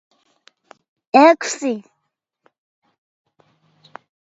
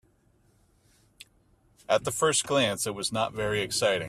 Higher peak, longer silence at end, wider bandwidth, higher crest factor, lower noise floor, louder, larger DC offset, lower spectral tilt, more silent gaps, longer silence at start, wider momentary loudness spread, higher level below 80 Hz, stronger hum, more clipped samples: first, 0 dBFS vs -10 dBFS; first, 2.55 s vs 0 s; second, 8.2 kHz vs 15.5 kHz; about the same, 22 dB vs 20 dB; first, -75 dBFS vs -65 dBFS; first, -16 LUFS vs -27 LUFS; neither; about the same, -3 dB/octave vs -2.5 dB/octave; neither; second, 1.15 s vs 1.9 s; first, 14 LU vs 5 LU; second, -72 dBFS vs -58 dBFS; neither; neither